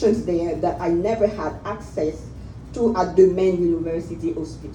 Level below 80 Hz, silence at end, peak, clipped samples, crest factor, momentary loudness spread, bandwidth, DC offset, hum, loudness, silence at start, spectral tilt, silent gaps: -42 dBFS; 0 s; -4 dBFS; under 0.1%; 18 dB; 15 LU; 9.2 kHz; under 0.1%; none; -22 LUFS; 0 s; -7.5 dB/octave; none